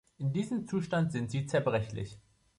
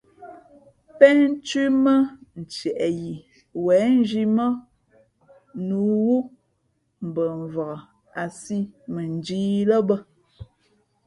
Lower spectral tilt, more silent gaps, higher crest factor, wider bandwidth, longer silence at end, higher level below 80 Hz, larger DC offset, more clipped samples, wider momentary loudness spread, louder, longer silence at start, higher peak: about the same, -7 dB/octave vs -6.5 dB/octave; neither; second, 16 dB vs 22 dB; about the same, 11.5 kHz vs 11.5 kHz; second, 0.4 s vs 0.6 s; about the same, -60 dBFS vs -62 dBFS; neither; neither; second, 9 LU vs 18 LU; second, -33 LUFS vs -22 LUFS; about the same, 0.2 s vs 0.2 s; second, -16 dBFS vs 0 dBFS